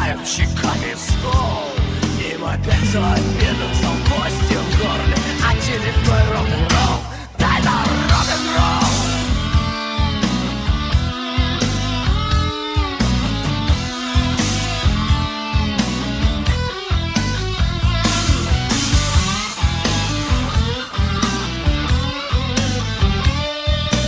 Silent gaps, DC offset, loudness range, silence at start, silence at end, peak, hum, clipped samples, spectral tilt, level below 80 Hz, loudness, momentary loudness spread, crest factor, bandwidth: none; under 0.1%; 2 LU; 0 s; 0 s; -2 dBFS; none; under 0.1%; -4.5 dB/octave; -22 dBFS; -18 LUFS; 5 LU; 16 dB; 8 kHz